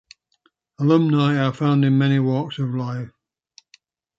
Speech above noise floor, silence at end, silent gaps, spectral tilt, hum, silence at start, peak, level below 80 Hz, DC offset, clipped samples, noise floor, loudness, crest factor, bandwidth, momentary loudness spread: 47 dB; 1.1 s; none; -8.5 dB/octave; none; 0.8 s; -4 dBFS; -64 dBFS; under 0.1%; under 0.1%; -66 dBFS; -20 LUFS; 16 dB; 7.4 kHz; 11 LU